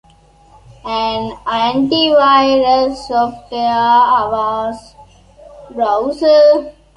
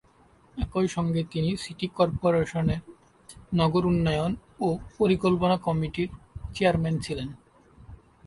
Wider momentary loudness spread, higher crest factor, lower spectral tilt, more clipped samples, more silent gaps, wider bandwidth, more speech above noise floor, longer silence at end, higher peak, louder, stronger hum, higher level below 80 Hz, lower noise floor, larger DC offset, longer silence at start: about the same, 12 LU vs 11 LU; second, 14 dB vs 20 dB; second, -5 dB/octave vs -7 dB/octave; neither; neither; about the same, 10.5 kHz vs 11.5 kHz; about the same, 34 dB vs 33 dB; about the same, 0.25 s vs 0.3 s; first, -2 dBFS vs -8 dBFS; first, -13 LUFS vs -27 LUFS; neither; about the same, -46 dBFS vs -46 dBFS; second, -47 dBFS vs -59 dBFS; neither; first, 0.85 s vs 0.55 s